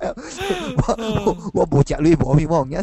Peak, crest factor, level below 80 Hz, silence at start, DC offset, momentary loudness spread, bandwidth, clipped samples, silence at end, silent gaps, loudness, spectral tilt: -4 dBFS; 14 dB; -32 dBFS; 0 s; under 0.1%; 8 LU; 12.5 kHz; under 0.1%; 0 s; none; -19 LUFS; -7 dB/octave